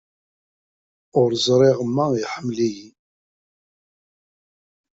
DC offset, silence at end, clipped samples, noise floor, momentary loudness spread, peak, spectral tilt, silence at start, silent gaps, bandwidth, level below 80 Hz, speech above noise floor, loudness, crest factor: under 0.1%; 2.05 s; under 0.1%; under -90 dBFS; 9 LU; -4 dBFS; -5.5 dB/octave; 1.15 s; none; 7.8 kHz; -62 dBFS; over 71 dB; -20 LUFS; 20 dB